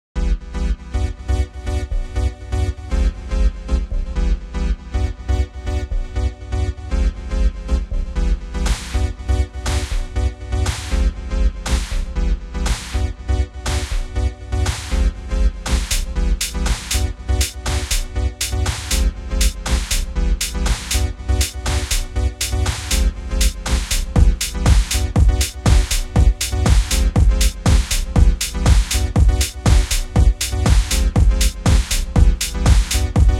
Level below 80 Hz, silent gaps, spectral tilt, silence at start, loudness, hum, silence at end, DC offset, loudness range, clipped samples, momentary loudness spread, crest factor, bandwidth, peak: -18 dBFS; none; -4 dB/octave; 0.15 s; -20 LUFS; none; 0 s; under 0.1%; 6 LU; under 0.1%; 8 LU; 16 dB; 16 kHz; 0 dBFS